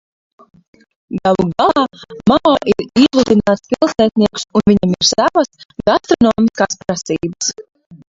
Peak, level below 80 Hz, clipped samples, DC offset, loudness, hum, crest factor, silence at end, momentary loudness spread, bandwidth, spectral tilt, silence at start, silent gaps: 0 dBFS; -44 dBFS; under 0.1%; under 0.1%; -14 LUFS; none; 14 dB; 0.1 s; 8 LU; 7.8 kHz; -4.5 dB/octave; 1.1 s; 5.65-5.69 s, 7.86-7.90 s